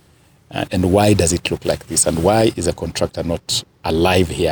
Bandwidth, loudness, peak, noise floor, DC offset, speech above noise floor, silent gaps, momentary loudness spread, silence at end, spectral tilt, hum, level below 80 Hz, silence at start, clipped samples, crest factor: over 20 kHz; -17 LUFS; -2 dBFS; -52 dBFS; under 0.1%; 35 dB; none; 8 LU; 0 s; -4.5 dB/octave; none; -36 dBFS; 0.5 s; under 0.1%; 14 dB